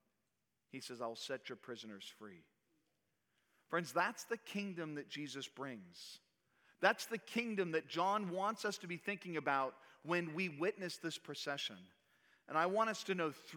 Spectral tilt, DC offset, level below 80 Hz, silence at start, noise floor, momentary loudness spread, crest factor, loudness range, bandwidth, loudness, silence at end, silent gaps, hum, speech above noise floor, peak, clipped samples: -4 dB/octave; under 0.1%; under -90 dBFS; 0.75 s; -87 dBFS; 16 LU; 26 dB; 6 LU; 19.5 kHz; -41 LUFS; 0 s; none; none; 46 dB; -16 dBFS; under 0.1%